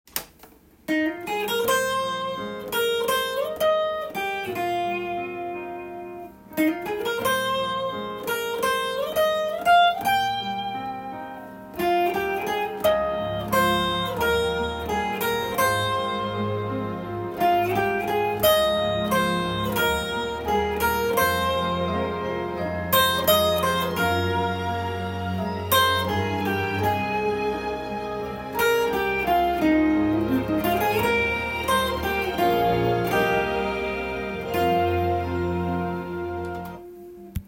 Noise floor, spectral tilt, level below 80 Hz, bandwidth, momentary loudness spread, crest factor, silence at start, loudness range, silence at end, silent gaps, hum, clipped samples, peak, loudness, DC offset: -51 dBFS; -4.5 dB/octave; -48 dBFS; 17 kHz; 10 LU; 18 dB; 0.15 s; 4 LU; 0.05 s; none; none; under 0.1%; -6 dBFS; -24 LUFS; under 0.1%